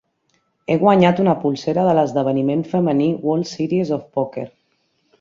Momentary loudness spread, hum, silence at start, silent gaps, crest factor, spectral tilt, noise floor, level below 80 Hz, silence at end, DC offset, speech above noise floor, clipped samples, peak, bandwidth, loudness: 10 LU; none; 0.7 s; none; 16 dB; -7.5 dB/octave; -66 dBFS; -60 dBFS; 0.75 s; under 0.1%; 49 dB; under 0.1%; -2 dBFS; 7.6 kHz; -18 LUFS